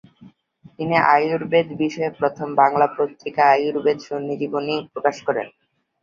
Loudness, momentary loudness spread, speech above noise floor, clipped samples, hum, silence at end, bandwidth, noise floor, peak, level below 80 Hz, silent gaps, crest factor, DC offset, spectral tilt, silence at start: -20 LUFS; 9 LU; 31 dB; under 0.1%; none; 0.55 s; 7.4 kHz; -51 dBFS; -2 dBFS; -64 dBFS; none; 18 dB; under 0.1%; -6 dB/octave; 0.2 s